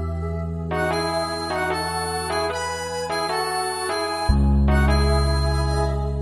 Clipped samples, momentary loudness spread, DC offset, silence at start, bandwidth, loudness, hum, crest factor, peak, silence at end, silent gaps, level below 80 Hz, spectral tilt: under 0.1%; 8 LU; under 0.1%; 0 s; 13 kHz; -23 LUFS; none; 16 dB; -6 dBFS; 0 s; none; -26 dBFS; -5 dB/octave